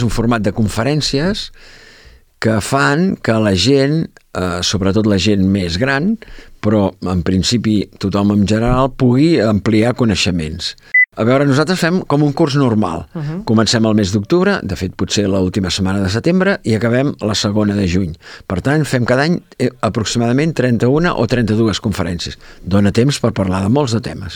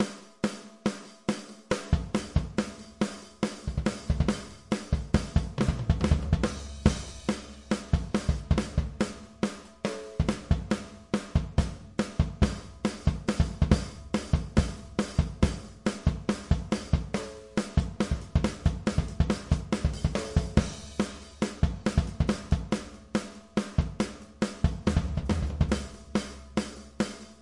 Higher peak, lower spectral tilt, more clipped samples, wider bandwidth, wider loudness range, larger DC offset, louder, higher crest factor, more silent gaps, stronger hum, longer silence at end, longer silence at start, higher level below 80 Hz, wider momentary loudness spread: first, 0 dBFS vs -6 dBFS; about the same, -5.5 dB/octave vs -6.5 dB/octave; neither; first, 18 kHz vs 11.5 kHz; about the same, 2 LU vs 2 LU; neither; first, -15 LUFS vs -31 LUFS; second, 14 dB vs 22 dB; neither; neither; about the same, 0 s vs 0.05 s; about the same, 0 s vs 0 s; about the same, -36 dBFS vs -36 dBFS; about the same, 8 LU vs 6 LU